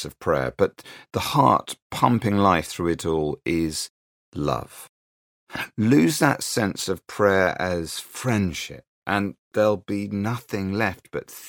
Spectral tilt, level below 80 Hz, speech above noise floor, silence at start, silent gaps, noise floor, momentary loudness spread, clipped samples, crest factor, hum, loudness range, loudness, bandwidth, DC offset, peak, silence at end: -5 dB/octave; -50 dBFS; over 67 dB; 0 s; 1.82-1.90 s, 3.90-4.32 s, 4.89-5.47 s, 8.88-9.02 s, 9.39-9.51 s; under -90 dBFS; 13 LU; under 0.1%; 20 dB; none; 4 LU; -23 LUFS; 19 kHz; under 0.1%; -2 dBFS; 0 s